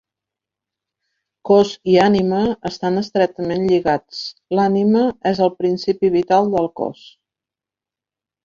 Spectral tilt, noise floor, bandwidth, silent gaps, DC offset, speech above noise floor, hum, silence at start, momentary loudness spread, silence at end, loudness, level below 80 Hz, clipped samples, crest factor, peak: -7 dB/octave; -89 dBFS; 7.4 kHz; none; under 0.1%; 72 dB; none; 1.45 s; 9 LU; 1.55 s; -17 LUFS; -54 dBFS; under 0.1%; 18 dB; -2 dBFS